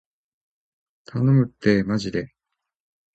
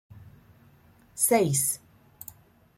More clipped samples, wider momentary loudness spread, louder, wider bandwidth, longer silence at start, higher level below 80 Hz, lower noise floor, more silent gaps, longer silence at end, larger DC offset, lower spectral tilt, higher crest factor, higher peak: neither; second, 13 LU vs 23 LU; about the same, -22 LUFS vs -24 LUFS; second, 8.2 kHz vs 16.5 kHz; first, 1.15 s vs 0.15 s; first, -54 dBFS vs -66 dBFS; first, -83 dBFS vs -58 dBFS; neither; about the same, 0.9 s vs 1 s; neither; first, -8 dB/octave vs -4 dB/octave; about the same, 20 dB vs 20 dB; first, -6 dBFS vs -10 dBFS